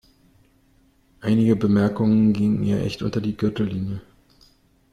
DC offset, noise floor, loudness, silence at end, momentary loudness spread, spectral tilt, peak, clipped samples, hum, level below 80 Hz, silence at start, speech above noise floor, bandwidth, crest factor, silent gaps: under 0.1%; -59 dBFS; -21 LUFS; 0.9 s; 11 LU; -8.5 dB/octave; -6 dBFS; under 0.1%; none; -50 dBFS; 1.2 s; 39 dB; 9.8 kHz; 16 dB; none